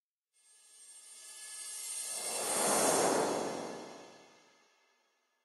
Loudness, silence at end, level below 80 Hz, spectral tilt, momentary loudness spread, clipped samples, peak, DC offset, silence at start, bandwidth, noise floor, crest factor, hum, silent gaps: -33 LUFS; 1.2 s; -84 dBFS; -1.5 dB/octave; 22 LU; under 0.1%; -16 dBFS; under 0.1%; 0.75 s; 14.5 kHz; -77 dBFS; 20 dB; none; none